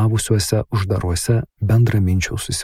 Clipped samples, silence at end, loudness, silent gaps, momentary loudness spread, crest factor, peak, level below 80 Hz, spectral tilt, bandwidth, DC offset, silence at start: under 0.1%; 0 s; -19 LUFS; none; 5 LU; 14 dB; -2 dBFS; -38 dBFS; -5.5 dB/octave; 15.5 kHz; 0.2%; 0 s